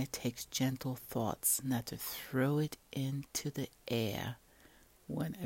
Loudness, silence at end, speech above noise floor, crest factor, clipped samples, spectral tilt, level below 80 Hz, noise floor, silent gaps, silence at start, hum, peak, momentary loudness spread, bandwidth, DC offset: -37 LUFS; 0 s; 26 dB; 18 dB; under 0.1%; -4.5 dB/octave; -64 dBFS; -63 dBFS; none; 0 s; none; -20 dBFS; 10 LU; 16.5 kHz; under 0.1%